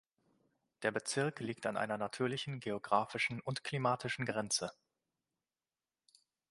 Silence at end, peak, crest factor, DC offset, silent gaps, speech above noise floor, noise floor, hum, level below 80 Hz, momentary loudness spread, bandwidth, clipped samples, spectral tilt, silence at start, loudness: 1.8 s; -16 dBFS; 24 dB; under 0.1%; none; over 53 dB; under -90 dBFS; none; -76 dBFS; 6 LU; 11.5 kHz; under 0.1%; -4 dB/octave; 0.8 s; -37 LUFS